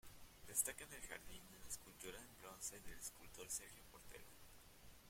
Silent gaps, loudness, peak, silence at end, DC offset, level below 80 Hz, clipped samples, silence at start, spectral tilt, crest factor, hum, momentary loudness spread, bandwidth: none; -50 LUFS; -24 dBFS; 0 s; under 0.1%; -68 dBFS; under 0.1%; 0.05 s; -1 dB/octave; 30 dB; none; 21 LU; 16.5 kHz